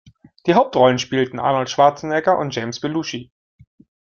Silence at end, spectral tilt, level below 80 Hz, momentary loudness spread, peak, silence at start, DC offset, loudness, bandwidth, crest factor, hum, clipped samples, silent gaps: 0.8 s; -5 dB/octave; -60 dBFS; 10 LU; -2 dBFS; 0.45 s; under 0.1%; -18 LUFS; 7.2 kHz; 18 dB; none; under 0.1%; none